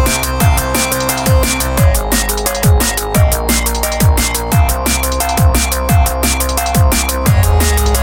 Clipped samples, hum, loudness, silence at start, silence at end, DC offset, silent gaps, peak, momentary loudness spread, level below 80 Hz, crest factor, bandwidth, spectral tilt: under 0.1%; none; -13 LUFS; 0 s; 0 s; under 0.1%; none; 0 dBFS; 2 LU; -16 dBFS; 12 dB; 17.5 kHz; -4 dB/octave